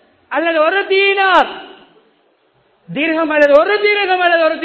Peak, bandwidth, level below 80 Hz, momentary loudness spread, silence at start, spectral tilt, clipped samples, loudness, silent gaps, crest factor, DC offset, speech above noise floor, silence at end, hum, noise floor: 0 dBFS; 8 kHz; -58 dBFS; 10 LU; 0.3 s; -5 dB/octave; 0.2%; -13 LUFS; none; 14 dB; under 0.1%; 44 dB; 0 s; none; -57 dBFS